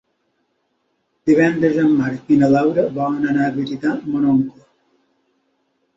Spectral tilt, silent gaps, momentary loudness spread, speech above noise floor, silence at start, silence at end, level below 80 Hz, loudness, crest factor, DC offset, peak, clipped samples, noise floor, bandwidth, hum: -8 dB/octave; none; 7 LU; 52 dB; 1.25 s; 1.45 s; -58 dBFS; -17 LUFS; 16 dB; under 0.1%; -2 dBFS; under 0.1%; -68 dBFS; 7.8 kHz; none